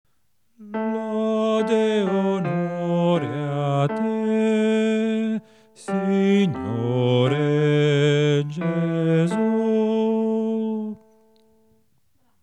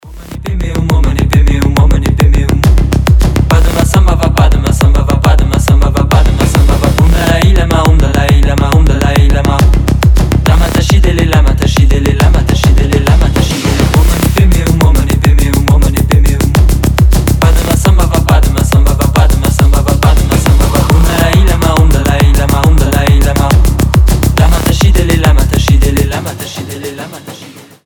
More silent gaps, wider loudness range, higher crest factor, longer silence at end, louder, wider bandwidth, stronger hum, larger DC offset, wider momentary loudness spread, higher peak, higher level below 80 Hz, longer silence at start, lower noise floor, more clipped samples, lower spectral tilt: neither; about the same, 3 LU vs 1 LU; first, 16 dB vs 8 dB; first, 1.45 s vs 0.25 s; second, -22 LUFS vs -9 LUFS; second, 10 kHz vs 19.5 kHz; neither; neither; first, 8 LU vs 2 LU; second, -6 dBFS vs 0 dBFS; second, -70 dBFS vs -10 dBFS; first, 0.6 s vs 0.05 s; first, -72 dBFS vs -32 dBFS; neither; first, -7.5 dB/octave vs -6 dB/octave